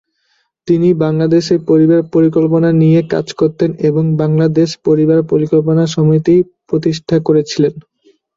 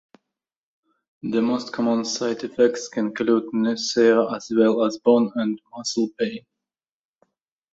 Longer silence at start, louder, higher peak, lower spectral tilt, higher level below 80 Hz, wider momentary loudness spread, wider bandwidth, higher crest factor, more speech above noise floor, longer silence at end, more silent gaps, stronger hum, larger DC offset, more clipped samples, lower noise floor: second, 0.65 s vs 1.25 s; first, -12 LUFS vs -22 LUFS; first, 0 dBFS vs -4 dBFS; first, -8 dB/octave vs -4.5 dB/octave; first, -52 dBFS vs -68 dBFS; second, 6 LU vs 9 LU; about the same, 7.6 kHz vs 8 kHz; second, 12 dB vs 18 dB; second, 50 dB vs 67 dB; second, 0.55 s vs 1.35 s; neither; neither; neither; neither; second, -62 dBFS vs -88 dBFS